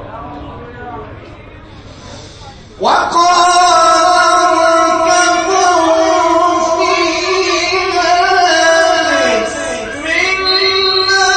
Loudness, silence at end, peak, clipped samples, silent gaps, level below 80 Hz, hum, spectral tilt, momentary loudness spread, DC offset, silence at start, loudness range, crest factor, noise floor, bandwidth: -10 LUFS; 0 s; 0 dBFS; under 0.1%; none; -42 dBFS; none; -2 dB/octave; 19 LU; under 0.1%; 0 s; 4 LU; 12 dB; -33 dBFS; 8.8 kHz